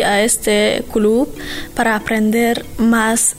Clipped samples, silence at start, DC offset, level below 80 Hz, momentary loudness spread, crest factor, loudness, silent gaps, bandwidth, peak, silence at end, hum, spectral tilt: under 0.1%; 0 s; under 0.1%; -38 dBFS; 5 LU; 12 dB; -15 LUFS; none; 16 kHz; -4 dBFS; 0 s; none; -3 dB/octave